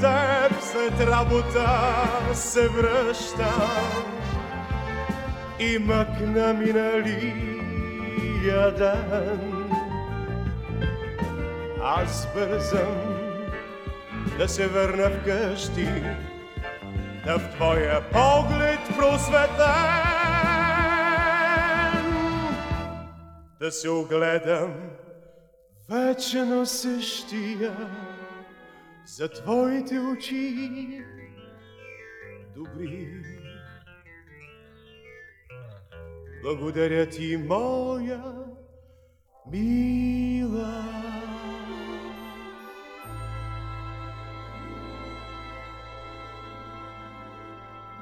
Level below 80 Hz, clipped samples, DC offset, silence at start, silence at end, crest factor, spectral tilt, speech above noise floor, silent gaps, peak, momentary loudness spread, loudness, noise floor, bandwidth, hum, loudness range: -38 dBFS; under 0.1%; under 0.1%; 0 s; 0 s; 20 dB; -5 dB/octave; 34 dB; none; -6 dBFS; 21 LU; -25 LUFS; -58 dBFS; 18.5 kHz; none; 17 LU